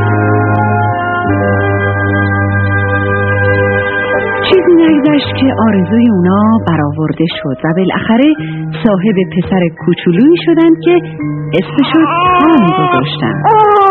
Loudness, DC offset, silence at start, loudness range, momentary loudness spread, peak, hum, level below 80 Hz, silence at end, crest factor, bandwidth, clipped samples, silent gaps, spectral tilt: -10 LUFS; 0.1%; 0 s; 2 LU; 6 LU; 0 dBFS; none; -42 dBFS; 0 s; 10 dB; 4.4 kHz; 0.1%; none; -10 dB/octave